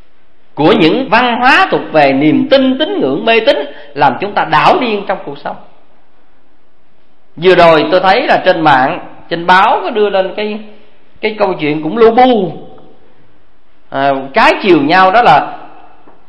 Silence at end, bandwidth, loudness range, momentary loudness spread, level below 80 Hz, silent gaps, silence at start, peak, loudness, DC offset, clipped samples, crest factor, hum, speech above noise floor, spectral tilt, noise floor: 0.6 s; 11 kHz; 4 LU; 13 LU; -46 dBFS; none; 0.55 s; 0 dBFS; -10 LUFS; 3%; 0.6%; 12 dB; none; 44 dB; -6 dB/octave; -54 dBFS